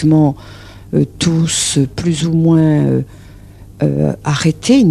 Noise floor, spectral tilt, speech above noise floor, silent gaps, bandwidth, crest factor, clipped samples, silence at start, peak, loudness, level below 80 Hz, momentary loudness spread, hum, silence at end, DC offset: -36 dBFS; -5.5 dB/octave; 24 dB; none; 13 kHz; 14 dB; under 0.1%; 0 s; 0 dBFS; -14 LUFS; -40 dBFS; 8 LU; none; 0 s; under 0.1%